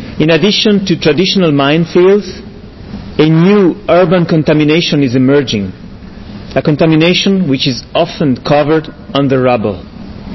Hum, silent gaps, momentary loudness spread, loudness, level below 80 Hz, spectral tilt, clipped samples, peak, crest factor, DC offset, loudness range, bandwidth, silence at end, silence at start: none; none; 18 LU; -10 LUFS; -38 dBFS; -6.5 dB/octave; under 0.1%; 0 dBFS; 10 dB; 0.2%; 2 LU; 6.2 kHz; 0 s; 0 s